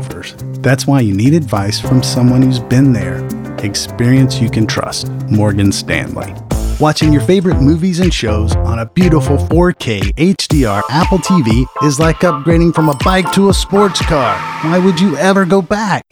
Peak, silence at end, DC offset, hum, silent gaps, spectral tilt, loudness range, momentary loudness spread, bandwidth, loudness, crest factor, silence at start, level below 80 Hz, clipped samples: 0 dBFS; 0.1 s; under 0.1%; none; none; -6 dB/octave; 2 LU; 7 LU; 17 kHz; -12 LUFS; 12 dB; 0 s; -24 dBFS; under 0.1%